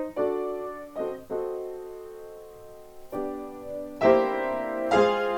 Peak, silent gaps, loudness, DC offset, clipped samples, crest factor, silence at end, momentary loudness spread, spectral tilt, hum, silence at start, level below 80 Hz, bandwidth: -6 dBFS; none; -28 LUFS; under 0.1%; under 0.1%; 22 dB; 0 s; 22 LU; -5.5 dB/octave; none; 0 s; -58 dBFS; 18.5 kHz